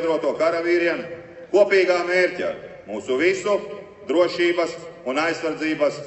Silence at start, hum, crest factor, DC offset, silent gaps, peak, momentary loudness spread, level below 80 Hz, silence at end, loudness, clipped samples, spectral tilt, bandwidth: 0 s; none; 18 dB; under 0.1%; none; -4 dBFS; 15 LU; -66 dBFS; 0 s; -21 LUFS; under 0.1%; -4.5 dB/octave; 8.4 kHz